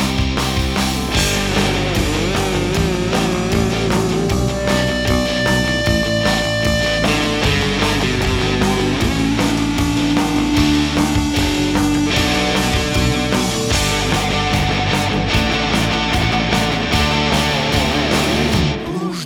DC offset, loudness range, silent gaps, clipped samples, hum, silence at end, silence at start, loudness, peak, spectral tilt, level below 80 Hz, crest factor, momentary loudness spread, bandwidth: under 0.1%; 1 LU; none; under 0.1%; none; 0 s; 0 s; -16 LUFS; 0 dBFS; -4.5 dB/octave; -26 dBFS; 16 dB; 2 LU; over 20 kHz